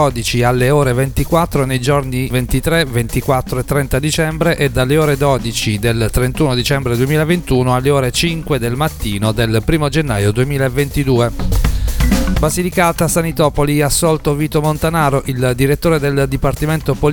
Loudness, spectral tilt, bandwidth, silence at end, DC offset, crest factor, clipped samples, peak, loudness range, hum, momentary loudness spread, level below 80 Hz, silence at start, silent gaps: -15 LUFS; -5.5 dB/octave; 19 kHz; 0 s; under 0.1%; 14 dB; under 0.1%; 0 dBFS; 1 LU; none; 4 LU; -24 dBFS; 0 s; none